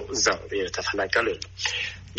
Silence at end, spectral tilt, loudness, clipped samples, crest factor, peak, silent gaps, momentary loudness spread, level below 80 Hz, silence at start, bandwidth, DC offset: 0 s; -1.5 dB/octave; -26 LUFS; under 0.1%; 20 dB; -6 dBFS; none; 6 LU; -50 dBFS; 0 s; 8.2 kHz; under 0.1%